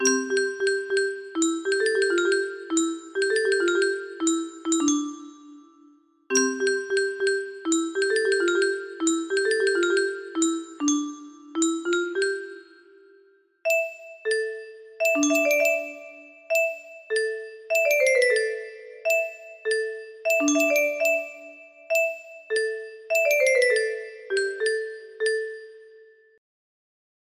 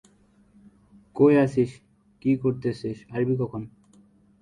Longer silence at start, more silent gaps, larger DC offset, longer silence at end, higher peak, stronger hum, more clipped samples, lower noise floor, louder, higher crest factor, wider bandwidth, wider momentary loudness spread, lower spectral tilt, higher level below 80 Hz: second, 0 s vs 1.15 s; neither; neither; first, 1.4 s vs 0.75 s; about the same, -8 dBFS vs -8 dBFS; neither; neither; about the same, -59 dBFS vs -59 dBFS; about the same, -24 LUFS vs -24 LUFS; about the same, 18 dB vs 18 dB; first, 15 kHz vs 10 kHz; about the same, 14 LU vs 16 LU; second, -0.5 dB/octave vs -9 dB/octave; second, -74 dBFS vs -60 dBFS